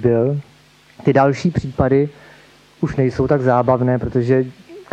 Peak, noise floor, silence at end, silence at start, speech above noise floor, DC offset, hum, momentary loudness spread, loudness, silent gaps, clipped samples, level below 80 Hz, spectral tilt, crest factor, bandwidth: -2 dBFS; -49 dBFS; 0.1 s; 0 s; 33 dB; under 0.1%; none; 9 LU; -18 LUFS; none; under 0.1%; -42 dBFS; -8.5 dB/octave; 16 dB; 8.4 kHz